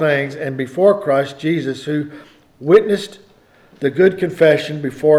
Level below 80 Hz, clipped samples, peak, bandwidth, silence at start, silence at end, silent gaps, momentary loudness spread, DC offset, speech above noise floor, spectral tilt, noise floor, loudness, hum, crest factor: -60 dBFS; under 0.1%; 0 dBFS; 13 kHz; 0 s; 0 s; none; 10 LU; under 0.1%; 34 dB; -6.5 dB/octave; -50 dBFS; -17 LUFS; none; 16 dB